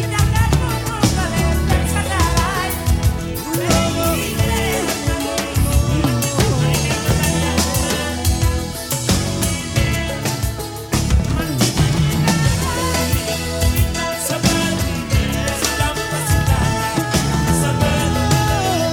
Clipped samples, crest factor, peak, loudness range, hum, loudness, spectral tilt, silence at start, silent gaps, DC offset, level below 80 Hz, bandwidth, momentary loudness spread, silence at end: under 0.1%; 16 dB; 0 dBFS; 1 LU; none; -18 LUFS; -4.5 dB/octave; 0 s; none; under 0.1%; -24 dBFS; 19.5 kHz; 4 LU; 0 s